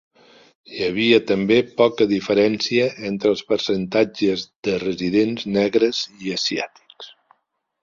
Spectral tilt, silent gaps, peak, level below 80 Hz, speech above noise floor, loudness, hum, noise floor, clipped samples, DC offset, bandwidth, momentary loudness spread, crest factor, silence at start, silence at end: -5 dB/octave; 4.56-4.63 s; -2 dBFS; -58 dBFS; 53 dB; -20 LUFS; none; -72 dBFS; under 0.1%; under 0.1%; 7.6 kHz; 10 LU; 18 dB; 0.7 s; 0.75 s